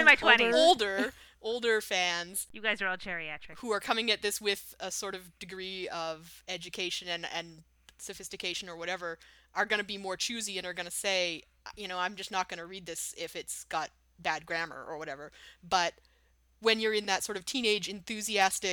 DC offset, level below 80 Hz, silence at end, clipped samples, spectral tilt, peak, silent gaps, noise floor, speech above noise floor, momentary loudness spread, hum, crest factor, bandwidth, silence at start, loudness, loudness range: under 0.1%; -66 dBFS; 0 s; under 0.1%; -1.5 dB/octave; -6 dBFS; none; -67 dBFS; 35 dB; 14 LU; none; 26 dB; 20 kHz; 0 s; -31 LUFS; 7 LU